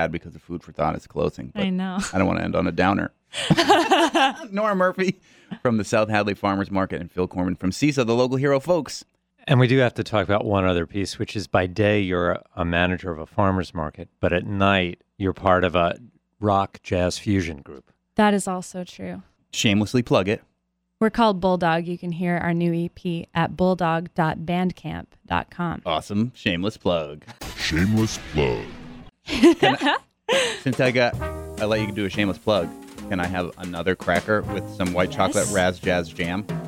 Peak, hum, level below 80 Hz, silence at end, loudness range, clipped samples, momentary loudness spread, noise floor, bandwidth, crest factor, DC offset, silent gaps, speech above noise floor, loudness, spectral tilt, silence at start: -4 dBFS; none; -46 dBFS; 0 s; 4 LU; under 0.1%; 11 LU; -74 dBFS; 16.5 kHz; 18 dB; under 0.1%; none; 51 dB; -23 LUFS; -5.5 dB/octave; 0 s